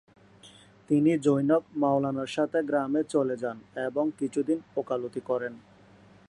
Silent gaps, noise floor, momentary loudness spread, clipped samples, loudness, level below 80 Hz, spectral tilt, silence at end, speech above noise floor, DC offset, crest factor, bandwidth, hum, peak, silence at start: none; -55 dBFS; 9 LU; under 0.1%; -28 LUFS; -72 dBFS; -7 dB/octave; 0.7 s; 28 dB; under 0.1%; 18 dB; 11 kHz; none; -10 dBFS; 0.45 s